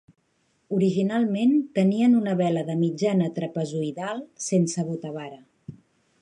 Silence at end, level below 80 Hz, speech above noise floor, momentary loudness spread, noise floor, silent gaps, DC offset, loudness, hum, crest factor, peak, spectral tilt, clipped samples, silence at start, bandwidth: 0.5 s; -70 dBFS; 46 dB; 12 LU; -69 dBFS; none; under 0.1%; -24 LUFS; none; 14 dB; -10 dBFS; -6.5 dB/octave; under 0.1%; 0.7 s; 11 kHz